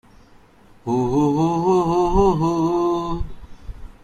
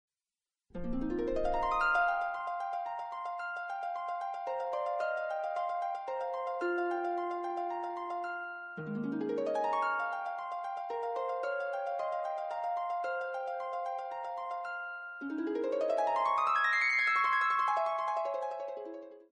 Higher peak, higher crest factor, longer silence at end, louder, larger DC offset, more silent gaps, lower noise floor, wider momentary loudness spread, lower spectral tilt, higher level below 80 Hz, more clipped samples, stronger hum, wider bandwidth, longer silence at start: first, -6 dBFS vs -18 dBFS; about the same, 16 dB vs 16 dB; about the same, 0.15 s vs 0.1 s; first, -19 LUFS vs -34 LUFS; neither; neither; second, -49 dBFS vs under -90 dBFS; first, 14 LU vs 11 LU; first, -8 dB/octave vs -5 dB/octave; first, -34 dBFS vs -56 dBFS; neither; neither; about the same, 9.6 kHz vs 10 kHz; about the same, 0.85 s vs 0.75 s